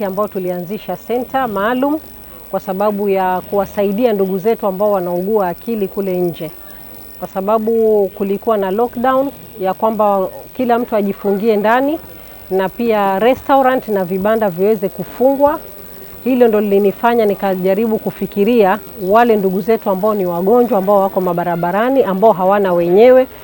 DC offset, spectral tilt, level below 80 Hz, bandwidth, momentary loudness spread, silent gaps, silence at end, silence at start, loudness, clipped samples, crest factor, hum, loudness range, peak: under 0.1%; -7.5 dB/octave; -46 dBFS; 18 kHz; 11 LU; none; 0 s; 0 s; -15 LUFS; under 0.1%; 14 dB; none; 4 LU; 0 dBFS